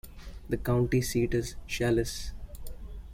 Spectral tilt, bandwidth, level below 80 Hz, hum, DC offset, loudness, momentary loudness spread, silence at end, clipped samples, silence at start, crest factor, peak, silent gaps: -5.5 dB/octave; 16.5 kHz; -42 dBFS; none; under 0.1%; -30 LUFS; 19 LU; 0 s; under 0.1%; 0.05 s; 16 dB; -14 dBFS; none